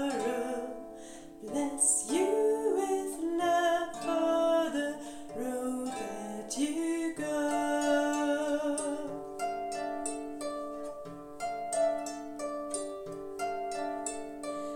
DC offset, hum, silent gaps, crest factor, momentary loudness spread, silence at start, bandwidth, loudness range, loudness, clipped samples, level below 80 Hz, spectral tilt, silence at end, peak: under 0.1%; none; none; 18 dB; 12 LU; 0 s; 17 kHz; 7 LU; -32 LUFS; under 0.1%; -64 dBFS; -2.5 dB/octave; 0 s; -14 dBFS